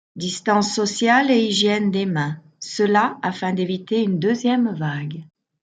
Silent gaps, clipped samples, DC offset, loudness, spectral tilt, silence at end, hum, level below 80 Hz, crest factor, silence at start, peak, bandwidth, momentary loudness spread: none; under 0.1%; under 0.1%; -20 LUFS; -4.5 dB/octave; 0.4 s; none; -66 dBFS; 16 dB; 0.15 s; -4 dBFS; 9.4 kHz; 11 LU